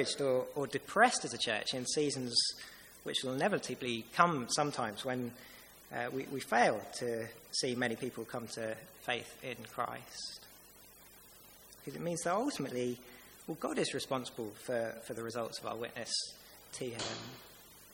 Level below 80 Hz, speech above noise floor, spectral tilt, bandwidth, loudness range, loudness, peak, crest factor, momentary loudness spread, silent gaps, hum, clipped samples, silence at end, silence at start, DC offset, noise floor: -72 dBFS; 22 dB; -3 dB/octave; 17 kHz; 8 LU; -36 LUFS; -10 dBFS; 28 dB; 22 LU; none; none; under 0.1%; 0 s; 0 s; under 0.1%; -58 dBFS